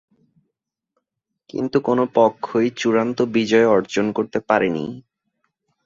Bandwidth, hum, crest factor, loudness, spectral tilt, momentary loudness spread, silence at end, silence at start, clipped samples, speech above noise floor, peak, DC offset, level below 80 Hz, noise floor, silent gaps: 7.8 kHz; none; 18 dB; -19 LUFS; -6 dB/octave; 11 LU; 0.85 s; 1.55 s; under 0.1%; 61 dB; -2 dBFS; under 0.1%; -62 dBFS; -80 dBFS; none